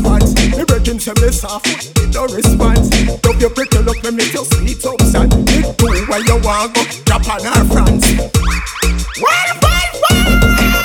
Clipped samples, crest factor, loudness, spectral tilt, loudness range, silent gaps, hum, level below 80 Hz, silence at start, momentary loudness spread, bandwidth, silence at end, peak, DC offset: under 0.1%; 12 dB; -13 LUFS; -4.5 dB/octave; 1 LU; none; none; -16 dBFS; 0 s; 5 LU; 18 kHz; 0 s; 0 dBFS; under 0.1%